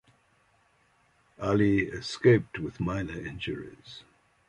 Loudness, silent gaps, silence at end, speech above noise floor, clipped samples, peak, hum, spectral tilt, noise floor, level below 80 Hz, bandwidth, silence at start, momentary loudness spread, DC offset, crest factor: -28 LUFS; none; 0.45 s; 39 dB; under 0.1%; -8 dBFS; none; -7 dB/octave; -67 dBFS; -52 dBFS; 10.5 kHz; 1.4 s; 22 LU; under 0.1%; 22 dB